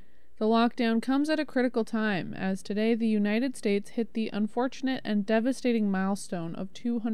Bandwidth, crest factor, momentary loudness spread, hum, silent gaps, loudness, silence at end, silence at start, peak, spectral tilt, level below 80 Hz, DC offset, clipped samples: 12.5 kHz; 14 dB; 7 LU; none; none; -28 LUFS; 0 s; 0.4 s; -14 dBFS; -6 dB/octave; -68 dBFS; 1%; under 0.1%